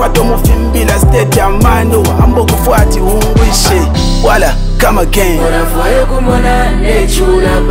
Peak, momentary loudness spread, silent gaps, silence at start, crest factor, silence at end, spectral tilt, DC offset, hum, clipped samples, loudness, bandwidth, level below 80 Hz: 0 dBFS; 3 LU; none; 0 s; 8 dB; 0 s; -5 dB/octave; under 0.1%; none; 0.6%; -10 LUFS; 16.5 kHz; -12 dBFS